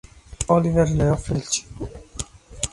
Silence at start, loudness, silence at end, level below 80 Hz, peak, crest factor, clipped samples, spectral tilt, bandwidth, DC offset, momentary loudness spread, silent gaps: 0.3 s; -22 LUFS; 0.05 s; -36 dBFS; -4 dBFS; 18 dB; under 0.1%; -5.5 dB/octave; 11.5 kHz; under 0.1%; 17 LU; none